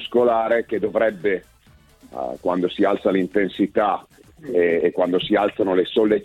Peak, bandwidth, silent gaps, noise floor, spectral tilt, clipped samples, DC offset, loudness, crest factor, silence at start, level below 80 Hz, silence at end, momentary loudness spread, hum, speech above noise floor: -6 dBFS; 10.5 kHz; none; -53 dBFS; -7 dB/octave; under 0.1%; under 0.1%; -21 LUFS; 16 dB; 0 s; -56 dBFS; 0 s; 9 LU; none; 33 dB